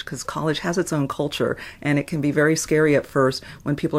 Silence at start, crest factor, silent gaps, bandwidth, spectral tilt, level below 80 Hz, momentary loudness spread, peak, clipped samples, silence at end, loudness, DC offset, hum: 0 s; 16 dB; none; 16 kHz; -5 dB/octave; -52 dBFS; 8 LU; -6 dBFS; under 0.1%; 0 s; -22 LUFS; under 0.1%; none